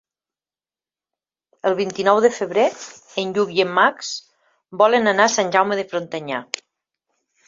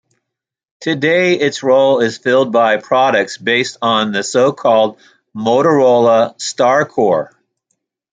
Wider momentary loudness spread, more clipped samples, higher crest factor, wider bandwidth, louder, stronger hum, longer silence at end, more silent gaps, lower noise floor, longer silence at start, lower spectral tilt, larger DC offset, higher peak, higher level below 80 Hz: first, 14 LU vs 8 LU; neither; first, 20 dB vs 14 dB; second, 7.8 kHz vs 9.4 kHz; second, -19 LUFS vs -13 LUFS; neither; first, 1.05 s vs 0.85 s; neither; first, under -90 dBFS vs -80 dBFS; first, 1.65 s vs 0.8 s; second, -3 dB/octave vs -4.5 dB/octave; neither; about the same, -2 dBFS vs 0 dBFS; second, -68 dBFS vs -62 dBFS